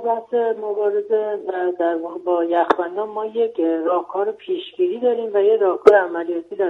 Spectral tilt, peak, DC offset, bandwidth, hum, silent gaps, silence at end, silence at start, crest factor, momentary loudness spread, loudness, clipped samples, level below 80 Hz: -6 dB/octave; 0 dBFS; under 0.1%; 6.4 kHz; none; none; 0 s; 0 s; 20 dB; 10 LU; -20 LUFS; under 0.1%; -68 dBFS